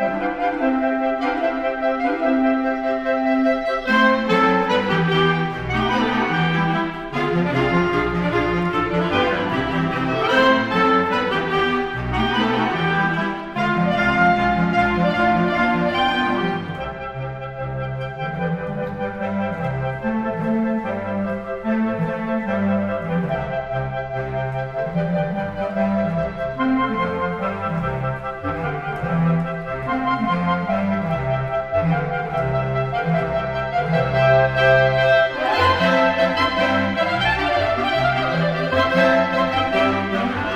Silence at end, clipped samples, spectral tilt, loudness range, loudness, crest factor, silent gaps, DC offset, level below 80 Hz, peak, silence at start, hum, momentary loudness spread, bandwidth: 0 s; under 0.1%; -7 dB/octave; 6 LU; -20 LUFS; 16 dB; none; under 0.1%; -42 dBFS; -4 dBFS; 0 s; none; 9 LU; 9.4 kHz